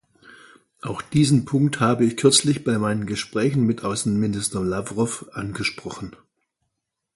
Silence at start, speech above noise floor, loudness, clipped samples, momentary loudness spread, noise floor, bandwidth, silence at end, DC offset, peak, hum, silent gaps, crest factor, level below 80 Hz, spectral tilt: 0.25 s; 58 dB; -22 LUFS; under 0.1%; 15 LU; -79 dBFS; 11.5 kHz; 1.05 s; under 0.1%; -2 dBFS; none; none; 20 dB; -52 dBFS; -5 dB/octave